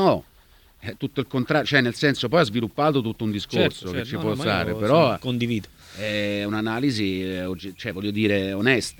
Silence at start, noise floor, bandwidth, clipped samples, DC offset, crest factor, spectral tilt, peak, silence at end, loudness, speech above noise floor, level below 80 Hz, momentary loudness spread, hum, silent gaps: 0 s; -54 dBFS; 19 kHz; under 0.1%; under 0.1%; 22 dB; -5.5 dB/octave; -2 dBFS; 0.05 s; -23 LUFS; 31 dB; -54 dBFS; 11 LU; none; none